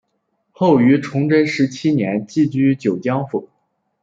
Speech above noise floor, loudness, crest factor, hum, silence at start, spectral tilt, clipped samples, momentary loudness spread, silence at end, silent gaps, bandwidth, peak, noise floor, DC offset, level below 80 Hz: 53 dB; -17 LUFS; 16 dB; none; 0.6 s; -7.5 dB/octave; under 0.1%; 7 LU; 0.55 s; none; 7.8 kHz; -2 dBFS; -69 dBFS; under 0.1%; -60 dBFS